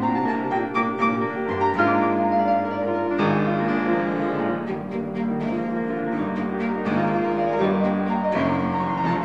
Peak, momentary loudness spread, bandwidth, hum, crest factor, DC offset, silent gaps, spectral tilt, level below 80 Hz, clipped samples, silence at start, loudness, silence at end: -8 dBFS; 5 LU; 7.8 kHz; none; 16 dB; 0.2%; none; -8.5 dB/octave; -62 dBFS; under 0.1%; 0 s; -23 LUFS; 0 s